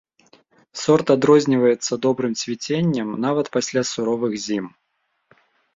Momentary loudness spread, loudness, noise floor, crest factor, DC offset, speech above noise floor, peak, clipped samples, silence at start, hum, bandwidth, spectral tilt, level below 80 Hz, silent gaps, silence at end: 11 LU; -20 LUFS; -72 dBFS; 18 dB; under 0.1%; 52 dB; -2 dBFS; under 0.1%; 0.75 s; none; 7.8 kHz; -5 dB/octave; -62 dBFS; none; 1.1 s